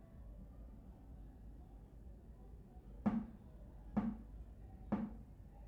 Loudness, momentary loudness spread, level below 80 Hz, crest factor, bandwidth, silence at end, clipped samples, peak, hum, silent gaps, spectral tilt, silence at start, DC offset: -46 LUFS; 17 LU; -56 dBFS; 22 dB; 4.6 kHz; 0 s; under 0.1%; -26 dBFS; none; none; -9.5 dB/octave; 0 s; under 0.1%